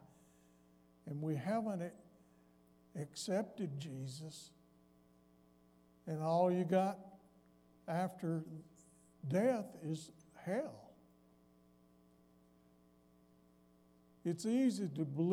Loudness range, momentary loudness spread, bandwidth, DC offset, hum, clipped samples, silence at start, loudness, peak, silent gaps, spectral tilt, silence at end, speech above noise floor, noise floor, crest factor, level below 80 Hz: 9 LU; 19 LU; 15.5 kHz; under 0.1%; none; under 0.1%; 1.05 s; -40 LUFS; -20 dBFS; none; -7 dB/octave; 0 s; 31 dB; -69 dBFS; 22 dB; -80 dBFS